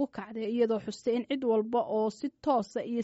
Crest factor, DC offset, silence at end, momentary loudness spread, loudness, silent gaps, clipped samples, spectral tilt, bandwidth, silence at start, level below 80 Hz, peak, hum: 14 dB; under 0.1%; 0 s; 6 LU; -31 LUFS; none; under 0.1%; -5 dB/octave; 8 kHz; 0 s; -72 dBFS; -16 dBFS; none